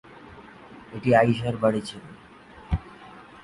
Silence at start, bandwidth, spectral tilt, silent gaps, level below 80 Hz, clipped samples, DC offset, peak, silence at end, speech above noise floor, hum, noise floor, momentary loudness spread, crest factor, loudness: 0.25 s; 11.5 kHz; -7 dB/octave; none; -42 dBFS; under 0.1%; under 0.1%; -6 dBFS; 0.2 s; 25 dB; none; -48 dBFS; 26 LU; 20 dB; -24 LUFS